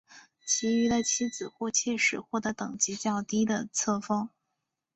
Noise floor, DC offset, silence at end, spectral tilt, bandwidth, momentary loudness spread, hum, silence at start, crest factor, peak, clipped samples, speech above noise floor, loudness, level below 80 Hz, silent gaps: -84 dBFS; under 0.1%; 0.65 s; -2.5 dB/octave; 8.2 kHz; 8 LU; none; 0.1 s; 20 dB; -10 dBFS; under 0.1%; 55 dB; -28 LUFS; -66 dBFS; none